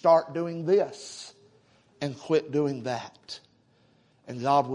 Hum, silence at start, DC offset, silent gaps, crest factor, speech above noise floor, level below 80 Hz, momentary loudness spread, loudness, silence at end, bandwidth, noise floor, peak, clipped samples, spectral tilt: none; 0.05 s; under 0.1%; none; 18 dB; 37 dB; -74 dBFS; 18 LU; -27 LUFS; 0 s; 11 kHz; -64 dBFS; -10 dBFS; under 0.1%; -6 dB/octave